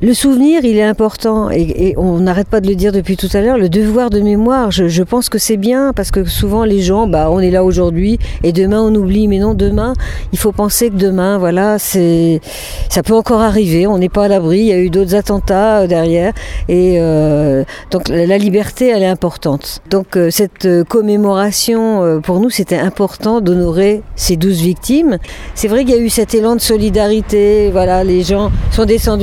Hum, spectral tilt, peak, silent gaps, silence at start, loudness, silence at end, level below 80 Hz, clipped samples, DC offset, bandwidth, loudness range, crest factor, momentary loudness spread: none; -5.5 dB/octave; 0 dBFS; none; 0 s; -12 LUFS; 0 s; -24 dBFS; under 0.1%; under 0.1%; 17.5 kHz; 1 LU; 12 dB; 5 LU